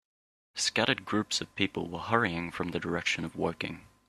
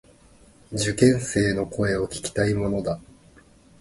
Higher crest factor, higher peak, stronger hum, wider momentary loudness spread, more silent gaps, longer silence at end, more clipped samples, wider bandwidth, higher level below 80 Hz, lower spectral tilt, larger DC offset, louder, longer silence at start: first, 26 dB vs 20 dB; second, -8 dBFS vs -4 dBFS; neither; about the same, 8 LU vs 10 LU; neither; second, 0.25 s vs 0.8 s; neither; first, 13.5 kHz vs 11.5 kHz; second, -64 dBFS vs -46 dBFS; second, -3.5 dB/octave vs -5.5 dB/octave; neither; second, -31 LUFS vs -24 LUFS; second, 0.55 s vs 0.7 s